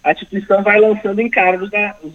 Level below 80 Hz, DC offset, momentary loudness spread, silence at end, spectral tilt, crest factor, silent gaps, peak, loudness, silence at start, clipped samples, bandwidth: -54 dBFS; under 0.1%; 7 LU; 0 s; -7 dB/octave; 14 dB; none; 0 dBFS; -14 LUFS; 0.05 s; under 0.1%; 6.8 kHz